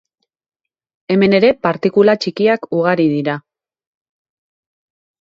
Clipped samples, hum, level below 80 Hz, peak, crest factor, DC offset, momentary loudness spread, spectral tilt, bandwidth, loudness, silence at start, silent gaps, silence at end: under 0.1%; none; -58 dBFS; 0 dBFS; 16 dB; under 0.1%; 7 LU; -7 dB/octave; 7.6 kHz; -14 LUFS; 1.1 s; none; 1.8 s